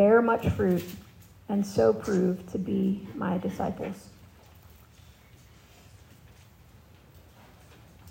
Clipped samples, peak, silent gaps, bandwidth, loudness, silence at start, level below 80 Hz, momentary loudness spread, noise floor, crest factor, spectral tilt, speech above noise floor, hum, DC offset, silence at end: under 0.1%; -10 dBFS; none; 16 kHz; -27 LUFS; 0 s; -56 dBFS; 15 LU; -54 dBFS; 20 dB; -7.5 dB/octave; 28 dB; none; under 0.1%; 0 s